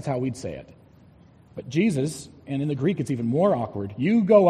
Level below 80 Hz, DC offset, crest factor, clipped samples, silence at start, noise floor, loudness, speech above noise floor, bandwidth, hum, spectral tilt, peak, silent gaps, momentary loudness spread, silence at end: -58 dBFS; under 0.1%; 18 dB; under 0.1%; 0 s; -52 dBFS; -25 LUFS; 30 dB; 13 kHz; none; -7.5 dB/octave; -4 dBFS; none; 16 LU; 0 s